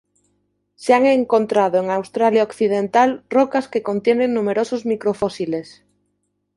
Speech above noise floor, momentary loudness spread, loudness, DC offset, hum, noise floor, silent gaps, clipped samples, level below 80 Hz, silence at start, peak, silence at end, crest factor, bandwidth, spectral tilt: 53 dB; 7 LU; -18 LUFS; under 0.1%; 50 Hz at -45 dBFS; -71 dBFS; none; under 0.1%; -62 dBFS; 0.8 s; -2 dBFS; 0.95 s; 18 dB; 11.5 kHz; -6 dB/octave